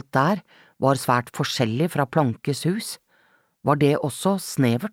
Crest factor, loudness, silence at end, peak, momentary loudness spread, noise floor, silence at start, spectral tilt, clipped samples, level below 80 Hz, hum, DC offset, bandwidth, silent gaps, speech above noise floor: 16 dB; -23 LUFS; 0.05 s; -6 dBFS; 9 LU; -62 dBFS; 0.15 s; -5.5 dB/octave; under 0.1%; -64 dBFS; none; under 0.1%; 16.5 kHz; none; 40 dB